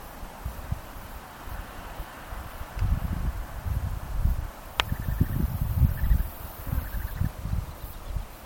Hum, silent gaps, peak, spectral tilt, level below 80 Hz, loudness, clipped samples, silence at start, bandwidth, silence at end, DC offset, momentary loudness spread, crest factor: none; none; 0 dBFS; -6 dB/octave; -32 dBFS; -32 LUFS; under 0.1%; 0 s; 17 kHz; 0 s; under 0.1%; 13 LU; 28 dB